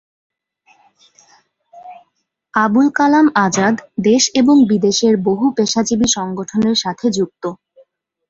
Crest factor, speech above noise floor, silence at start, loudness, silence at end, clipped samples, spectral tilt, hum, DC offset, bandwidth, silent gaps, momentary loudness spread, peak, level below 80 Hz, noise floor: 14 dB; 55 dB; 1.75 s; -14 LUFS; 0.75 s; under 0.1%; -4 dB/octave; none; under 0.1%; 7.8 kHz; none; 9 LU; -2 dBFS; -54 dBFS; -69 dBFS